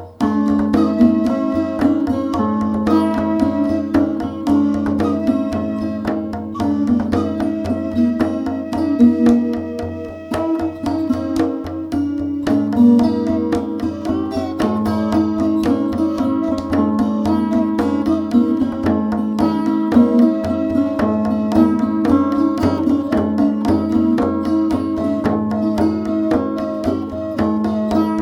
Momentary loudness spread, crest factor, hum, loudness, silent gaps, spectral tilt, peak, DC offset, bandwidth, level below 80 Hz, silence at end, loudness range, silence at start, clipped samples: 7 LU; 16 dB; none; -17 LUFS; none; -8 dB/octave; 0 dBFS; under 0.1%; 12 kHz; -42 dBFS; 0 s; 3 LU; 0 s; under 0.1%